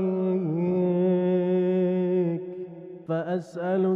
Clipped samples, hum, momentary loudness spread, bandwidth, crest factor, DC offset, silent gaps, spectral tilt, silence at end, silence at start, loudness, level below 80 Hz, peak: under 0.1%; none; 12 LU; 5.4 kHz; 10 dB; under 0.1%; none; -10 dB/octave; 0 s; 0 s; -25 LUFS; -72 dBFS; -14 dBFS